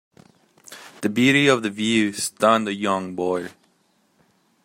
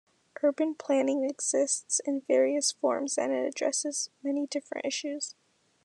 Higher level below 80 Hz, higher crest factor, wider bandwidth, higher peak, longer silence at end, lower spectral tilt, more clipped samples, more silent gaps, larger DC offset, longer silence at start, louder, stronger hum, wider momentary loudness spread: first, -66 dBFS vs under -90 dBFS; about the same, 20 dB vs 16 dB; first, 16 kHz vs 12 kHz; first, -2 dBFS vs -14 dBFS; first, 1.15 s vs 0.55 s; first, -4 dB/octave vs -1 dB/octave; neither; neither; neither; first, 0.7 s vs 0.45 s; first, -20 LUFS vs -29 LUFS; neither; first, 13 LU vs 7 LU